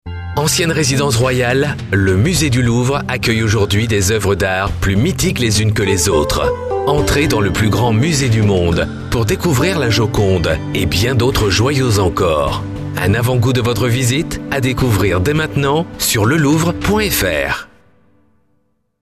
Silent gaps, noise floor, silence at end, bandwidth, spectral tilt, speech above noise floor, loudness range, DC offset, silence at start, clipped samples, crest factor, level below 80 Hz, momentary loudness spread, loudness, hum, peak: none; -63 dBFS; 1.4 s; 14 kHz; -5 dB/octave; 49 dB; 1 LU; 0.4%; 0.05 s; under 0.1%; 12 dB; -30 dBFS; 4 LU; -15 LUFS; none; -2 dBFS